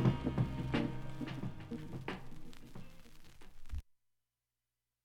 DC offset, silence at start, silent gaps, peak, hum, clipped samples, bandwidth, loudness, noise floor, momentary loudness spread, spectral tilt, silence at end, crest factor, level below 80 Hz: under 0.1%; 0 s; none; -18 dBFS; 60 Hz at -70 dBFS; under 0.1%; 11.5 kHz; -41 LUFS; under -90 dBFS; 24 LU; -7.5 dB/octave; 1.2 s; 22 dB; -52 dBFS